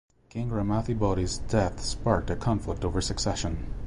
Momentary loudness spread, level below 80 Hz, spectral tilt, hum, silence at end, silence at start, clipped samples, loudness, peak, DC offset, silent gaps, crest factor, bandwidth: 5 LU; -36 dBFS; -5.5 dB/octave; none; 0 s; 0.35 s; under 0.1%; -29 LUFS; -10 dBFS; under 0.1%; none; 18 dB; 11.5 kHz